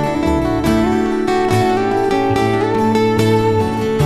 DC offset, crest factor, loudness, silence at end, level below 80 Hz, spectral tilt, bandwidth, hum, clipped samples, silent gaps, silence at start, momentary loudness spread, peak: under 0.1%; 12 dB; -15 LUFS; 0 s; -32 dBFS; -6.5 dB/octave; 14 kHz; none; under 0.1%; none; 0 s; 3 LU; -2 dBFS